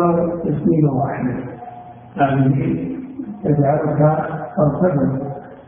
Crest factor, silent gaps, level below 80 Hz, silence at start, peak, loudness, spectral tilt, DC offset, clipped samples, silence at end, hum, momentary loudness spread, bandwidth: 16 dB; none; -48 dBFS; 0 s; -2 dBFS; -18 LUFS; -14 dB/octave; under 0.1%; under 0.1%; 0.05 s; none; 14 LU; 3.5 kHz